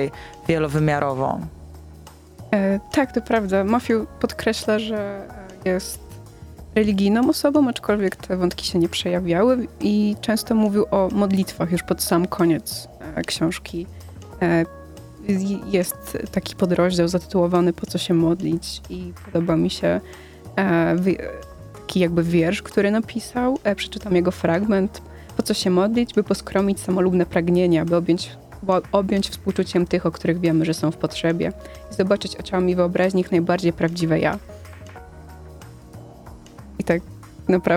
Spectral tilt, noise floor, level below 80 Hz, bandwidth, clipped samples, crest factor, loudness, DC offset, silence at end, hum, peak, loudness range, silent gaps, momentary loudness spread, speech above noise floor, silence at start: -6 dB/octave; -43 dBFS; -44 dBFS; 16.5 kHz; under 0.1%; 20 dB; -21 LUFS; under 0.1%; 0 s; none; -2 dBFS; 4 LU; none; 17 LU; 23 dB; 0 s